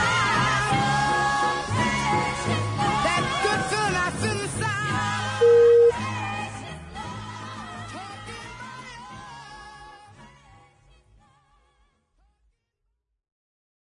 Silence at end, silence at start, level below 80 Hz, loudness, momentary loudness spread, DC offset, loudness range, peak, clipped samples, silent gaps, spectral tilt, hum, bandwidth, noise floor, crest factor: 3.55 s; 0 s; -48 dBFS; -22 LUFS; 21 LU; under 0.1%; 19 LU; -10 dBFS; under 0.1%; none; -4.5 dB/octave; none; 11 kHz; -77 dBFS; 16 dB